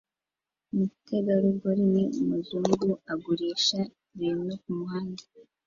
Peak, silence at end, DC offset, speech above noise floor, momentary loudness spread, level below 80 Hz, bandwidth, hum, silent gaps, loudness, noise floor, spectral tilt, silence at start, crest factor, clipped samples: -8 dBFS; 0.25 s; under 0.1%; over 62 dB; 9 LU; -68 dBFS; 7.4 kHz; none; none; -28 LUFS; under -90 dBFS; -6 dB/octave; 0.75 s; 20 dB; under 0.1%